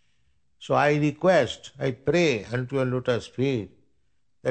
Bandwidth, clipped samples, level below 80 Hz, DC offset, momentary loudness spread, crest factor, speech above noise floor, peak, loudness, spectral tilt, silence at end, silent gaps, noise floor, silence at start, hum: 9 kHz; under 0.1%; -58 dBFS; under 0.1%; 10 LU; 18 dB; 50 dB; -8 dBFS; -25 LUFS; -6 dB/octave; 0 s; none; -74 dBFS; 0.6 s; none